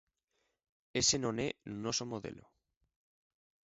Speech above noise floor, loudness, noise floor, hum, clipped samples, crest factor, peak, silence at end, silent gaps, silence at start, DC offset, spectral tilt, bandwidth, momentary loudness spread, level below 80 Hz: 46 dB; -35 LUFS; -82 dBFS; none; under 0.1%; 24 dB; -16 dBFS; 1.25 s; none; 0.95 s; under 0.1%; -3.5 dB/octave; 7.6 kHz; 13 LU; -64 dBFS